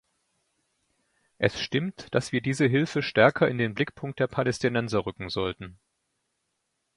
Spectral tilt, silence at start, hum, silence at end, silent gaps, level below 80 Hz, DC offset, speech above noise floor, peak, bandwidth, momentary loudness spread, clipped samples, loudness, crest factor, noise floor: -6 dB/octave; 1.4 s; none; 1.25 s; none; -58 dBFS; under 0.1%; 52 dB; -4 dBFS; 11.5 kHz; 10 LU; under 0.1%; -26 LUFS; 24 dB; -78 dBFS